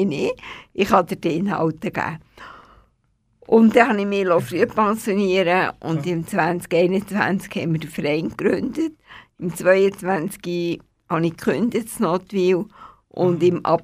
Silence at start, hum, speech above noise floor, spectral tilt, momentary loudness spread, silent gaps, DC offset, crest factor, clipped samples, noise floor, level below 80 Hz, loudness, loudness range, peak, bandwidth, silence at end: 0 s; none; 45 dB; -6.5 dB/octave; 10 LU; none; under 0.1%; 20 dB; under 0.1%; -65 dBFS; -56 dBFS; -20 LUFS; 4 LU; 0 dBFS; 15.5 kHz; 0 s